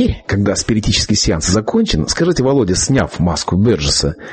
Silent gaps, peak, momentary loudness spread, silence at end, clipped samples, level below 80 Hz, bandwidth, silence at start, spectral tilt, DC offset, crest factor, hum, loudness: none; -2 dBFS; 3 LU; 0 s; under 0.1%; -28 dBFS; 8.8 kHz; 0 s; -4.5 dB/octave; under 0.1%; 14 dB; none; -14 LUFS